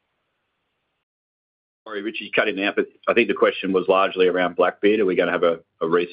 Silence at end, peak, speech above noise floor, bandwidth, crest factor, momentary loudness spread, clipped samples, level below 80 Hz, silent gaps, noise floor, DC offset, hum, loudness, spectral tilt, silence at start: 0 s; -4 dBFS; 54 dB; 5.2 kHz; 18 dB; 8 LU; under 0.1%; -68 dBFS; none; -74 dBFS; under 0.1%; none; -21 LUFS; -9 dB/octave; 1.85 s